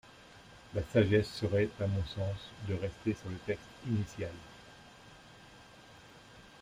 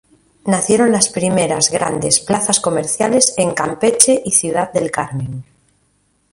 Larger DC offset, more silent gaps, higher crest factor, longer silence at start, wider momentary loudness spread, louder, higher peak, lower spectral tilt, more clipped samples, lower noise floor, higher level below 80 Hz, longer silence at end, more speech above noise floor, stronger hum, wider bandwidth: neither; neither; first, 22 dB vs 16 dB; second, 0.05 s vs 0.45 s; first, 25 LU vs 10 LU; second, -35 LUFS vs -14 LUFS; second, -14 dBFS vs 0 dBFS; first, -7 dB/octave vs -3 dB/octave; neither; second, -56 dBFS vs -61 dBFS; second, -58 dBFS vs -52 dBFS; second, 0 s vs 0.9 s; second, 22 dB vs 45 dB; neither; second, 11.5 kHz vs 16 kHz